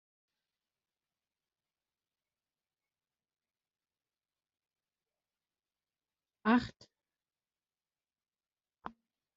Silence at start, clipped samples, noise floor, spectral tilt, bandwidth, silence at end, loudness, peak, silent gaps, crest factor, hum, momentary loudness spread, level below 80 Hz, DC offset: 6.45 s; under 0.1%; under -90 dBFS; -4 dB/octave; 5.8 kHz; 0.5 s; -32 LUFS; -18 dBFS; none; 26 dB; none; 21 LU; -74 dBFS; under 0.1%